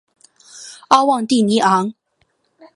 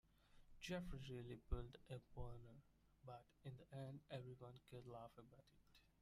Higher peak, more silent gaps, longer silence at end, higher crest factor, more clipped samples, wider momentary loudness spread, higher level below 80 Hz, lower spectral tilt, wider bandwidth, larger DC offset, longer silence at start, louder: first, 0 dBFS vs -32 dBFS; neither; first, 0.85 s vs 0.15 s; second, 18 dB vs 24 dB; neither; first, 22 LU vs 11 LU; about the same, -64 dBFS vs -62 dBFS; second, -4.5 dB/octave vs -6 dB/octave; second, 11.5 kHz vs 14.5 kHz; neither; first, 0.55 s vs 0.05 s; first, -15 LUFS vs -56 LUFS